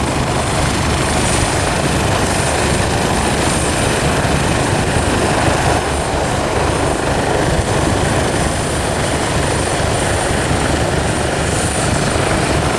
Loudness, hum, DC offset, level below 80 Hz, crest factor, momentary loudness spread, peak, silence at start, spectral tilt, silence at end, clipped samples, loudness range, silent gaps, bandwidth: -15 LUFS; none; under 0.1%; -26 dBFS; 14 dB; 2 LU; -2 dBFS; 0 s; -4 dB/octave; 0 s; under 0.1%; 1 LU; none; 14 kHz